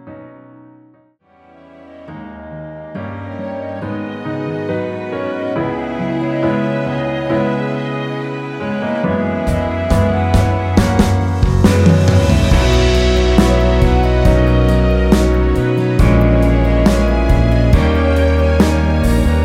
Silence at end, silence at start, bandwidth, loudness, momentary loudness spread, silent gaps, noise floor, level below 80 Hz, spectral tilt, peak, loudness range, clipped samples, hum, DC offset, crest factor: 0 s; 0.05 s; 15 kHz; -15 LUFS; 12 LU; none; -51 dBFS; -18 dBFS; -7 dB/octave; 0 dBFS; 13 LU; under 0.1%; none; under 0.1%; 14 dB